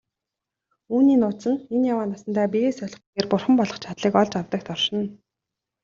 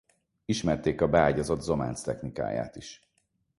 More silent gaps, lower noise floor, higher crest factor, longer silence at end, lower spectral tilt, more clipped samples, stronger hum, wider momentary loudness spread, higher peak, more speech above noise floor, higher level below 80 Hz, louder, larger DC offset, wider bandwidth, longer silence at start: first, 3.07-3.13 s vs none; first, -86 dBFS vs -75 dBFS; about the same, 20 dB vs 22 dB; about the same, 0.7 s vs 0.65 s; about the same, -6 dB/octave vs -6 dB/octave; neither; neither; second, 10 LU vs 17 LU; about the same, -4 dBFS vs -6 dBFS; first, 64 dB vs 47 dB; second, -64 dBFS vs -48 dBFS; first, -23 LUFS vs -28 LUFS; neither; second, 7.4 kHz vs 11.5 kHz; first, 0.9 s vs 0.5 s